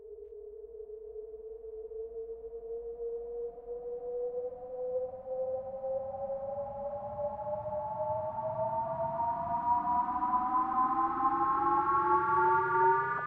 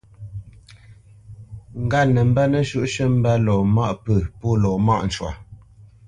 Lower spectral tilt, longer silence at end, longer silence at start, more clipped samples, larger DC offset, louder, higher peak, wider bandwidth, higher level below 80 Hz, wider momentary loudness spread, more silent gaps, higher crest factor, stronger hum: first, -9.5 dB/octave vs -7 dB/octave; second, 0 s vs 0.5 s; second, 0 s vs 0.2 s; neither; neither; second, -33 LUFS vs -20 LUFS; second, -16 dBFS vs -6 dBFS; second, 4.5 kHz vs 9.8 kHz; second, -62 dBFS vs -40 dBFS; about the same, 18 LU vs 20 LU; neither; about the same, 16 dB vs 14 dB; neither